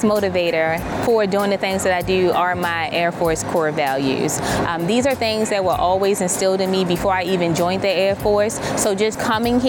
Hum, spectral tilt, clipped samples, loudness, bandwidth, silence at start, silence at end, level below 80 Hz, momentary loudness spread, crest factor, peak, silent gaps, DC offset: none; -4.5 dB/octave; under 0.1%; -19 LUFS; 19 kHz; 0 s; 0 s; -44 dBFS; 3 LU; 12 dB; -6 dBFS; none; under 0.1%